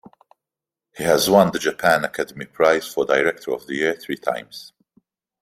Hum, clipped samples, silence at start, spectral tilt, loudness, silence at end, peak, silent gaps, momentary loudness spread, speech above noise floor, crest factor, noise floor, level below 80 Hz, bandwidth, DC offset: none; under 0.1%; 0.95 s; -4 dB/octave; -20 LUFS; 0.8 s; -2 dBFS; none; 13 LU; 68 dB; 20 dB; -88 dBFS; -60 dBFS; 16 kHz; under 0.1%